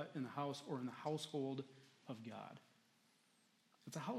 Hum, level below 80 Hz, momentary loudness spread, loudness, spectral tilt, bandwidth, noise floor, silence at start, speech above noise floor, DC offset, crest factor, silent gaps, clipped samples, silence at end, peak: none; under -90 dBFS; 15 LU; -47 LUFS; -5.5 dB/octave; 14.5 kHz; -76 dBFS; 0 s; 30 dB; under 0.1%; 20 dB; none; under 0.1%; 0 s; -30 dBFS